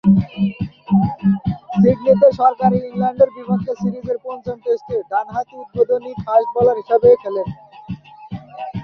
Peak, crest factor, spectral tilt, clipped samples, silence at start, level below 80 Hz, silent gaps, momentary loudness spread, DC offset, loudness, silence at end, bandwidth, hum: -2 dBFS; 16 dB; -10 dB/octave; under 0.1%; 0.05 s; -46 dBFS; none; 17 LU; under 0.1%; -17 LUFS; 0 s; 6 kHz; none